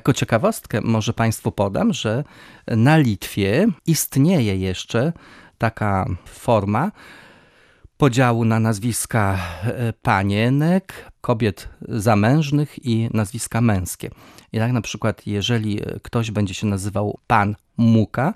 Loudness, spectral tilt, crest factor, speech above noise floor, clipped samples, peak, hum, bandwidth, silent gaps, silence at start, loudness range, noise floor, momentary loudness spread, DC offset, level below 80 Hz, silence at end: -20 LUFS; -6 dB/octave; 18 dB; 33 dB; under 0.1%; -2 dBFS; none; 14.5 kHz; none; 0.05 s; 4 LU; -52 dBFS; 9 LU; under 0.1%; -48 dBFS; 0 s